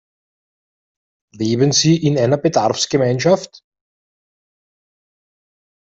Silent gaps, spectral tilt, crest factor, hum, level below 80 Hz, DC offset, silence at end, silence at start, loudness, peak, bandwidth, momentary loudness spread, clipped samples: none; -5 dB/octave; 18 dB; none; -56 dBFS; under 0.1%; 2.4 s; 1.35 s; -16 LUFS; -2 dBFS; 8.2 kHz; 7 LU; under 0.1%